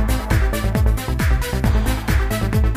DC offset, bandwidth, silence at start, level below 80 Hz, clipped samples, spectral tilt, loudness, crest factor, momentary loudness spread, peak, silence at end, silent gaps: under 0.1%; 16 kHz; 0 s; -20 dBFS; under 0.1%; -6 dB/octave; -20 LUFS; 12 dB; 1 LU; -6 dBFS; 0 s; none